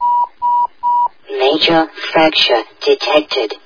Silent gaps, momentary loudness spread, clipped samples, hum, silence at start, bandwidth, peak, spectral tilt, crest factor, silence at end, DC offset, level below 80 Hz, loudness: none; 6 LU; under 0.1%; none; 0 s; 5.4 kHz; 0 dBFS; -4 dB/octave; 14 dB; 0.1 s; 0.4%; -50 dBFS; -14 LUFS